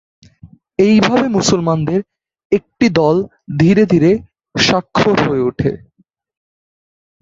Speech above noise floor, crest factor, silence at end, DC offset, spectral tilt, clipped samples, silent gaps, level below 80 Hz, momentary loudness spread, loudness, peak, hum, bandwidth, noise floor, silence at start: 46 dB; 14 dB; 1.45 s; under 0.1%; -5.5 dB/octave; under 0.1%; 2.45-2.50 s; -46 dBFS; 9 LU; -14 LUFS; 0 dBFS; none; 7.8 kHz; -59 dBFS; 0.45 s